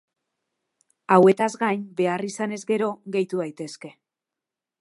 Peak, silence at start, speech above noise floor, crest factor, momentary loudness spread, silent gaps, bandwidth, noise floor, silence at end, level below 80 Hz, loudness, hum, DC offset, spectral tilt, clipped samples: -2 dBFS; 1.1 s; 65 dB; 22 dB; 20 LU; none; 11.5 kHz; -88 dBFS; 0.9 s; -76 dBFS; -23 LUFS; none; under 0.1%; -6 dB/octave; under 0.1%